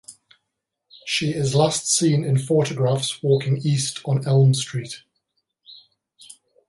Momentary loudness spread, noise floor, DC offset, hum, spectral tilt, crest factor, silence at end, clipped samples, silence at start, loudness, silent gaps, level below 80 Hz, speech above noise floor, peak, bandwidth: 10 LU; -80 dBFS; under 0.1%; none; -5 dB/octave; 16 dB; 0.35 s; under 0.1%; 0.1 s; -21 LUFS; none; -62 dBFS; 60 dB; -6 dBFS; 11.5 kHz